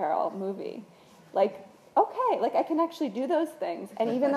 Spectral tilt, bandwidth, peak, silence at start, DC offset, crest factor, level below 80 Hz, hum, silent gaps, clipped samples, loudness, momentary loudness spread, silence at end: -6.5 dB/octave; 14.5 kHz; -10 dBFS; 0 s; under 0.1%; 18 dB; -82 dBFS; none; none; under 0.1%; -29 LUFS; 9 LU; 0 s